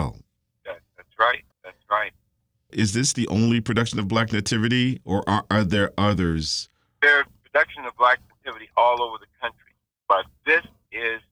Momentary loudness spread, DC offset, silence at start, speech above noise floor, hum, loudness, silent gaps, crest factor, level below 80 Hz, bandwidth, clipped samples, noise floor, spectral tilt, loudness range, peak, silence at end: 13 LU; under 0.1%; 0 s; 49 dB; none; -22 LUFS; none; 20 dB; -48 dBFS; 16 kHz; under 0.1%; -72 dBFS; -4.5 dB/octave; 3 LU; -4 dBFS; 0.15 s